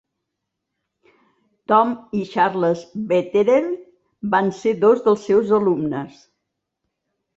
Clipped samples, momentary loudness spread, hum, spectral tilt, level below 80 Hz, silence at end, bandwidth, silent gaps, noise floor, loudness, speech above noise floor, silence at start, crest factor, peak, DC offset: under 0.1%; 12 LU; none; -7 dB/octave; -64 dBFS; 1.3 s; 7.8 kHz; none; -80 dBFS; -19 LUFS; 61 dB; 1.7 s; 18 dB; -2 dBFS; under 0.1%